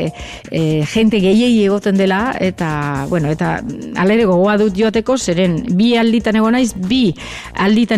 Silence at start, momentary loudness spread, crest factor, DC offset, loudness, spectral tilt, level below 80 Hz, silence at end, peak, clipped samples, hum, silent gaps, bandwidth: 0 s; 7 LU; 10 dB; under 0.1%; -15 LUFS; -6 dB/octave; -40 dBFS; 0 s; -4 dBFS; under 0.1%; none; none; 13.5 kHz